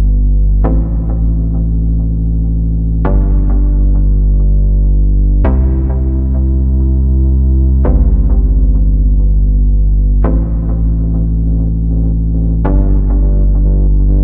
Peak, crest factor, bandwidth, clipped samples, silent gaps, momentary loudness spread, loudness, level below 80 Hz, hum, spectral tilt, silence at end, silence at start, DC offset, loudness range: 0 dBFS; 10 dB; 2 kHz; under 0.1%; none; 3 LU; -13 LUFS; -10 dBFS; none; -13.5 dB/octave; 0 s; 0 s; under 0.1%; 2 LU